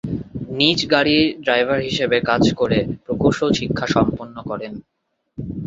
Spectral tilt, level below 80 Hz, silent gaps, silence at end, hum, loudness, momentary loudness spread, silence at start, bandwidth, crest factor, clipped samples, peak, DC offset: -5.5 dB/octave; -44 dBFS; none; 0 s; none; -19 LUFS; 15 LU; 0.05 s; 7.8 kHz; 18 dB; under 0.1%; -2 dBFS; under 0.1%